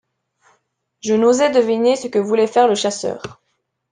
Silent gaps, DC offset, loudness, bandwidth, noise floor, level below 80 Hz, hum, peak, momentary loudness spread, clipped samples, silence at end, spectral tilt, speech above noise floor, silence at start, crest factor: none; under 0.1%; -16 LUFS; 9.8 kHz; -71 dBFS; -64 dBFS; none; -2 dBFS; 14 LU; under 0.1%; 0.6 s; -4 dB/octave; 55 dB; 1.05 s; 16 dB